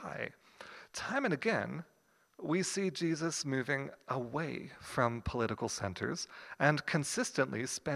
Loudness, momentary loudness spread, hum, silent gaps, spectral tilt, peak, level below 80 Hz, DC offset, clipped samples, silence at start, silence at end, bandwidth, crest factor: -35 LUFS; 12 LU; none; none; -4.5 dB/octave; -10 dBFS; -60 dBFS; under 0.1%; under 0.1%; 0 s; 0 s; 15.5 kHz; 26 dB